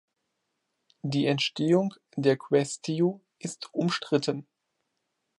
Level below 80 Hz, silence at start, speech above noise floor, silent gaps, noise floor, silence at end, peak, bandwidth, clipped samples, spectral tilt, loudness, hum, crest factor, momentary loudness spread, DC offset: -76 dBFS; 1.05 s; 53 dB; none; -80 dBFS; 1 s; -10 dBFS; 11.5 kHz; under 0.1%; -5.5 dB/octave; -28 LUFS; none; 20 dB; 13 LU; under 0.1%